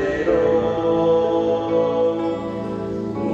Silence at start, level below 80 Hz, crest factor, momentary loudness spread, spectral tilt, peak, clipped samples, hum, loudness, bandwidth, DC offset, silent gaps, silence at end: 0 s; -46 dBFS; 12 dB; 9 LU; -7.5 dB/octave; -6 dBFS; under 0.1%; none; -20 LUFS; 7.6 kHz; under 0.1%; none; 0 s